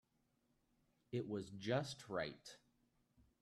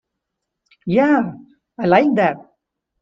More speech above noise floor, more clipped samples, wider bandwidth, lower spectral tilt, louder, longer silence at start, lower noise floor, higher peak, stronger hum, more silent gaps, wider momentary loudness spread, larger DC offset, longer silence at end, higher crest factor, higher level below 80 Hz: second, 37 dB vs 63 dB; neither; first, 13 kHz vs 7.2 kHz; second, -5.5 dB/octave vs -8.5 dB/octave; second, -45 LUFS vs -17 LUFS; first, 1.1 s vs 0.85 s; about the same, -82 dBFS vs -79 dBFS; second, -26 dBFS vs 0 dBFS; neither; neither; about the same, 17 LU vs 15 LU; neither; first, 0.85 s vs 0.6 s; about the same, 22 dB vs 20 dB; second, -78 dBFS vs -60 dBFS